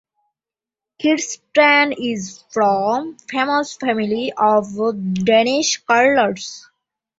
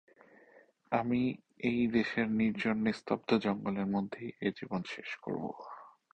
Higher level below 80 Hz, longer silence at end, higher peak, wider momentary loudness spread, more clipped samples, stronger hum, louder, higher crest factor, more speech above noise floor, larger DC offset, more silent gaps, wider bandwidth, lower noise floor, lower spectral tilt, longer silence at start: first, -60 dBFS vs -66 dBFS; first, 0.6 s vs 0.25 s; first, -2 dBFS vs -14 dBFS; about the same, 11 LU vs 10 LU; neither; neither; first, -17 LUFS vs -34 LUFS; about the same, 18 dB vs 20 dB; first, 72 dB vs 30 dB; neither; neither; about the same, 8 kHz vs 8.6 kHz; first, -90 dBFS vs -63 dBFS; second, -3.5 dB/octave vs -7 dB/octave; about the same, 1 s vs 0.9 s